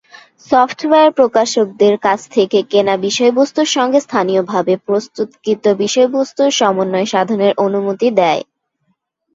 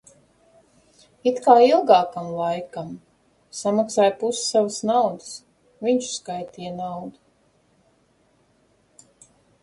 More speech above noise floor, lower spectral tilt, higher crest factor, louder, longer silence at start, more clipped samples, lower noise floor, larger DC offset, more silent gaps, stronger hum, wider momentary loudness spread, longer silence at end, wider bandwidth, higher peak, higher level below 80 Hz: first, 52 dB vs 42 dB; about the same, -4 dB/octave vs -4 dB/octave; second, 14 dB vs 22 dB; first, -14 LUFS vs -21 LUFS; second, 0.5 s vs 1.25 s; neither; first, -66 dBFS vs -62 dBFS; neither; neither; neither; second, 4 LU vs 21 LU; second, 0.9 s vs 2.55 s; second, 7.8 kHz vs 11.5 kHz; about the same, 0 dBFS vs -2 dBFS; first, -62 dBFS vs -68 dBFS